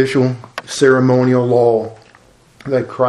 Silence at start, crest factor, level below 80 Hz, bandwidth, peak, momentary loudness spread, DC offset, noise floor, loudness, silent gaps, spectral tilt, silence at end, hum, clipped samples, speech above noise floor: 0 s; 14 dB; -56 dBFS; 12 kHz; 0 dBFS; 15 LU; under 0.1%; -48 dBFS; -14 LUFS; none; -6.5 dB/octave; 0 s; none; under 0.1%; 35 dB